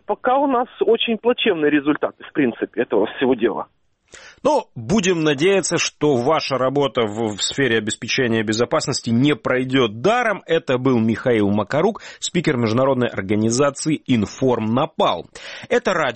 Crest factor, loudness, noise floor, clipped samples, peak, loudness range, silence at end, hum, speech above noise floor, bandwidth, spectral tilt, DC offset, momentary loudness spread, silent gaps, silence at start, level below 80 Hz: 14 dB; -19 LUFS; -45 dBFS; under 0.1%; -4 dBFS; 2 LU; 0 s; none; 26 dB; 8.8 kHz; -4.5 dB/octave; under 0.1%; 5 LU; none; 0.1 s; -54 dBFS